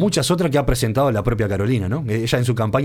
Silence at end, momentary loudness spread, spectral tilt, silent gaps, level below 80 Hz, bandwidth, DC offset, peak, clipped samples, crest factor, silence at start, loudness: 0 s; 3 LU; -5.5 dB/octave; none; -32 dBFS; 17 kHz; under 0.1%; -2 dBFS; under 0.1%; 16 dB; 0 s; -19 LUFS